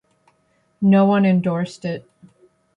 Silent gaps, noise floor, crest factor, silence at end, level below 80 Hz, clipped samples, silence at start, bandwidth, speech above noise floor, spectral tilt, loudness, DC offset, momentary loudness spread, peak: none; -64 dBFS; 16 dB; 0.75 s; -62 dBFS; under 0.1%; 0.8 s; 7.8 kHz; 47 dB; -8.5 dB/octave; -18 LUFS; under 0.1%; 15 LU; -6 dBFS